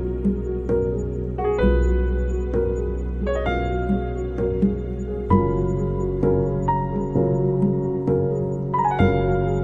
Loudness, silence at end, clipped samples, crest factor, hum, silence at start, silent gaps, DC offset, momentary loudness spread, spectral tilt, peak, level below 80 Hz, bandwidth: -22 LUFS; 0 s; under 0.1%; 18 dB; none; 0 s; none; under 0.1%; 6 LU; -9.5 dB/octave; -4 dBFS; -28 dBFS; 7.4 kHz